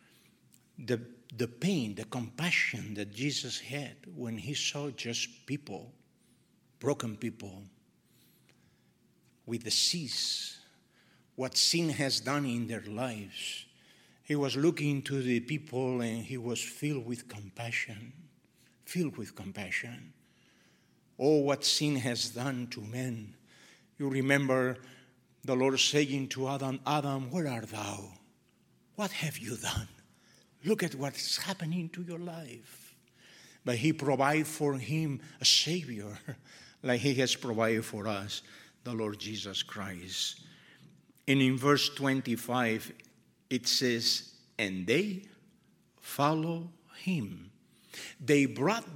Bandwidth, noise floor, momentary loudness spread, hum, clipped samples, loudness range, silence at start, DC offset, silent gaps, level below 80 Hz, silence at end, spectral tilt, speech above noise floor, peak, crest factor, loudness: 17 kHz; -68 dBFS; 17 LU; none; under 0.1%; 8 LU; 0.8 s; under 0.1%; none; -68 dBFS; 0 s; -4 dB/octave; 36 dB; -10 dBFS; 24 dB; -32 LUFS